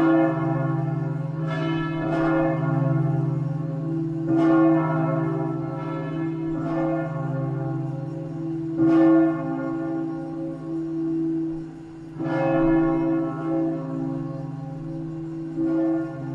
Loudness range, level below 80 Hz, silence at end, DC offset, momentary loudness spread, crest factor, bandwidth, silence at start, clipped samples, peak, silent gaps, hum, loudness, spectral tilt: 5 LU; -50 dBFS; 0 s; under 0.1%; 12 LU; 16 dB; 5.6 kHz; 0 s; under 0.1%; -8 dBFS; none; none; -24 LUFS; -10 dB/octave